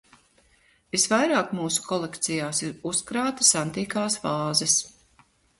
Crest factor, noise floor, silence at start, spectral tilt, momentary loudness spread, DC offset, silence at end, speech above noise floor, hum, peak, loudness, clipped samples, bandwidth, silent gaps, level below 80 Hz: 22 dB; -62 dBFS; 0.95 s; -2.5 dB/octave; 9 LU; under 0.1%; 0.7 s; 37 dB; none; -4 dBFS; -24 LUFS; under 0.1%; 12 kHz; none; -64 dBFS